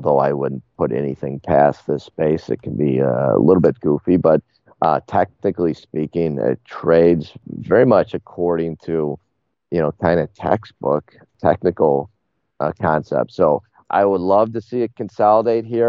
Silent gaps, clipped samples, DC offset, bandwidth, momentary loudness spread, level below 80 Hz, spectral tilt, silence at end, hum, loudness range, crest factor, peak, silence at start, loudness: none; under 0.1%; under 0.1%; 7 kHz; 10 LU; -50 dBFS; -7.5 dB/octave; 0 s; none; 3 LU; 16 dB; 0 dBFS; 0 s; -18 LUFS